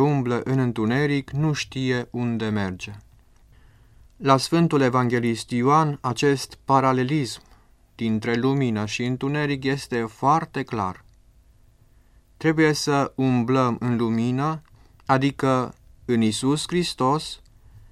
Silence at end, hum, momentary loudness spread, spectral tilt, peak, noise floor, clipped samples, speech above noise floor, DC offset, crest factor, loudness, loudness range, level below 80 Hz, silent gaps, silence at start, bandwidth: 0.15 s; none; 9 LU; -6 dB/octave; -2 dBFS; -55 dBFS; under 0.1%; 33 dB; under 0.1%; 20 dB; -23 LUFS; 5 LU; -54 dBFS; none; 0 s; 14.5 kHz